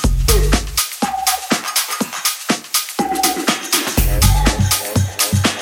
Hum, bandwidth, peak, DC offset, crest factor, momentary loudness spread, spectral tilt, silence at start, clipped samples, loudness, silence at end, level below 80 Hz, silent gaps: none; 17 kHz; 0 dBFS; under 0.1%; 16 dB; 5 LU; -3 dB/octave; 0 s; under 0.1%; -16 LUFS; 0 s; -22 dBFS; none